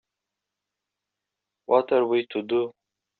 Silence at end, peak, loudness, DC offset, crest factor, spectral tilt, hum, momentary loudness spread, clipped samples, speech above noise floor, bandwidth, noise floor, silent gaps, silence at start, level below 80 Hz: 0.5 s; -6 dBFS; -24 LUFS; under 0.1%; 22 dB; -3.5 dB/octave; 50 Hz at -70 dBFS; 6 LU; under 0.1%; 63 dB; 4.4 kHz; -86 dBFS; none; 1.7 s; -74 dBFS